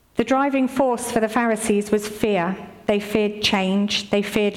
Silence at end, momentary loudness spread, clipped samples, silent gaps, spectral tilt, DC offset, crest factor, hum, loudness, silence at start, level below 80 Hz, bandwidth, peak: 0 s; 4 LU; under 0.1%; none; -4.5 dB/octave; under 0.1%; 14 dB; none; -21 LUFS; 0.15 s; -54 dBFS; 16 kHz; -8 dBFS